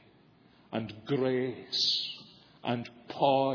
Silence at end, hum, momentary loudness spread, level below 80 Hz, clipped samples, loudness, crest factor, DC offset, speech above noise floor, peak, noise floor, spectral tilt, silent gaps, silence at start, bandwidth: 0 s; none; 13 LU; -74 dBFS; under 0.1%; -31 LUFS; 18 dB; under 0.1%; 31 dB; -14 dBFS; -61 dBFS; -5 dB/octave; none; 0.7 s; 5.4 kHz